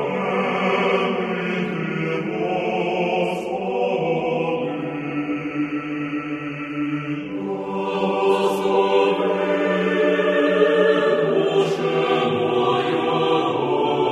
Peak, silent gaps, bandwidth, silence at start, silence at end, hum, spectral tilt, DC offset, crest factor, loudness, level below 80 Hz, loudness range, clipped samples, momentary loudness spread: -4 dBFS; none; 13 kHz; 0 s; 0 s; none; -6.5 dB/octave; under 0.1%; 16 dB; -21 LUFS; -62 dBFS; 7 LU; under 0.1%; 8 LU